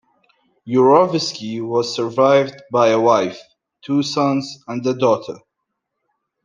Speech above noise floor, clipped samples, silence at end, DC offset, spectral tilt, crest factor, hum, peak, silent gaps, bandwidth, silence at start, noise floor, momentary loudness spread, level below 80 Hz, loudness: 60 dB; under 0.1%; 1.05 s; under 0.1%; -5.5 dB/octave; 16 dB; none; -2 dBFS; none; 9.6 kHz; 0.65 s; -77 dBFS; 12 LU; -68 dBFS; -17 LUFS